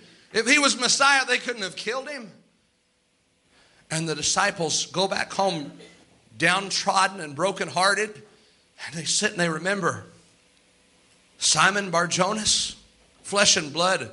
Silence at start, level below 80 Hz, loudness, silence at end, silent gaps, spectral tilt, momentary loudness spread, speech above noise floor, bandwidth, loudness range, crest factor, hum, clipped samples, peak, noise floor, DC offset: 0.35 s; -62 dBFS; -22 LUFS; 0 s; none; -2 dB/octave; 13 LU; 44 dB; 11.5 kHz; 5 LU; 22 dB; none; under 0.1%; -4 dBFS; -68 dBFS; under 0.1%